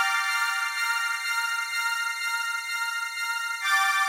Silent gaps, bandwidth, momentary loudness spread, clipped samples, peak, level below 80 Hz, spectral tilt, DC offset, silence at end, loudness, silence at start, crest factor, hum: none; 16 kHz; 5 LU; under 0.1%; -10 dBFS; under -90 dBFS; 6.5 dB/octave; under 0.1%; 0 s; -26 LUFS; 0 s; 16 dB; none